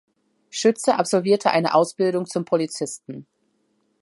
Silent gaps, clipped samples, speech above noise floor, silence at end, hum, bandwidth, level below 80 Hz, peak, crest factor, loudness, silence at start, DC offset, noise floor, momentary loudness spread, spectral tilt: none; under 0.1%; 47 dB; 0.8 s; none; 11.5 kHz; -74 dBFS; -4 dBFS; 18 dB; -21 LUFS; 0.55 s; under 0.1%; -68 dBFS; 15 LU; -4.5 dB/octave